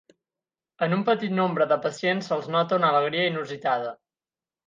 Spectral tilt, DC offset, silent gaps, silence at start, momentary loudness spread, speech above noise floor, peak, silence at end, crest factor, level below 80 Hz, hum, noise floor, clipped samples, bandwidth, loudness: -6 dB/octave; under 0.1%; none; 0.8 s; 7 LU; over 66 dB; -8 dBFS; 0.75 s; 18 dB; -76 dBFS; none; under -90 dBFS; under 0.1%; 9.6 kHz; -24 LUFS